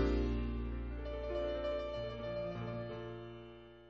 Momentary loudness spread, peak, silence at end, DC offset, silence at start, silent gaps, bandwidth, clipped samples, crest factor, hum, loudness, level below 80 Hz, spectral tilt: 11 LU; -24 dBFS; 0 s; under 0.1%; 0 s; none; 6.8 kHz; under 0.1%; 16 dB; none; -41 LUFS; -44 dBFS; -6.5 dB/octave